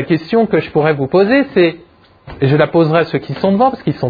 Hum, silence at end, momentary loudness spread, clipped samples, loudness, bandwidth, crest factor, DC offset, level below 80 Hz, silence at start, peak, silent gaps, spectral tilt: none; 0 s; 4 LU; under 0.1%; -13 LUFS; 5 kHz; 14 dB; under 0.1%; -46 dBFS; 0 s; 0 dBFS; none; -9.5 dB/octave